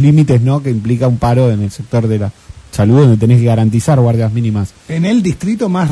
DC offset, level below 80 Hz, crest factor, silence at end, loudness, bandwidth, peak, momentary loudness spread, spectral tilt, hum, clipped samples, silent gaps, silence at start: under 0.1%; -38 dBFS; 12 dB; 0 s; -12 LUFS; 11 kHz; 0 dBFS; 9 LU; -8 dB/octave; none; 0.1%; none; 0 s